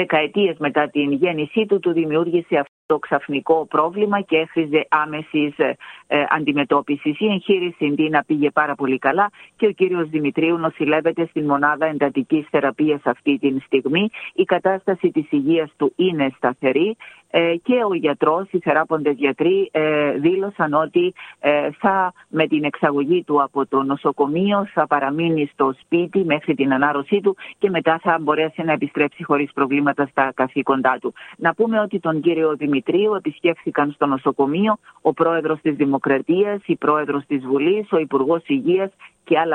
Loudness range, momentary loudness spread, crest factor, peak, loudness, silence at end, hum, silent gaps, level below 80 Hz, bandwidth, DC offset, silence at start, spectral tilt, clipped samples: 1 LU; 4 LU; 18 dB; -2 dBFS; -19 LUFS; 0 s; none; 2.68-2.89 s; -66 dBFS; 9.2 kHz; under 0.1%; 0 s; -8 dB/octave; under 0.1%